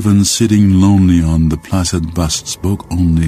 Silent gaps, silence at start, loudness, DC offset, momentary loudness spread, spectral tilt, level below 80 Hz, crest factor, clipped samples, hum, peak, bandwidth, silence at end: none; 0 s; -13 LUFS; under 0.1%; 8 LU; -5.5 dB/octave; -26 dBFS; 12 dB; under 0.1%; none; 0 dBFS; 15.5 kHz; 0 s